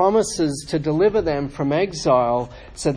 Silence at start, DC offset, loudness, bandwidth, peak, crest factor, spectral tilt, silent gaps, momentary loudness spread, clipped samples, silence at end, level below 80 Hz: 0 s; under 0.1%; -20 LUFS; 10.5 kHz; -4 dBFS; 16 dB; -5.5 dB/octave; none; 6 LU; under 0.1%; 0 s; -44 dBFS